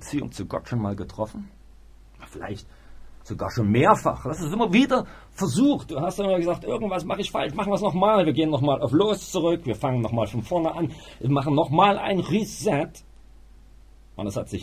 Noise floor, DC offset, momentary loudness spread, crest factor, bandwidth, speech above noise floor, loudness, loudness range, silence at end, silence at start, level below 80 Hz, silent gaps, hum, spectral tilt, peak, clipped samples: -49 dBFS; under 0.1%; 14 LU; 22 dB; 15.5 kHz; 25 dB; -24 LUFS; 3 LU; 0 s; 0 s; -48 dBFS; none; none; -6 dB/octave; -2 dBFS; under 0.1%